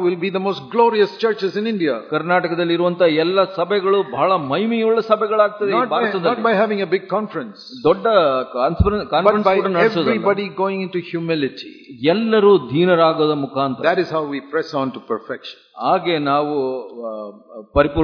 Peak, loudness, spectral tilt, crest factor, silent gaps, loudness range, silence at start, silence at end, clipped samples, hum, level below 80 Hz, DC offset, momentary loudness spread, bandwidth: 0 dBFS; -18 LUFS; -7.5 dB/octave; 18 dB; none; 4 LU; 0 s; 0 s; under 0.1%; none; -40 dBFS; under 0.1%; 10 LU; 5.4 kHz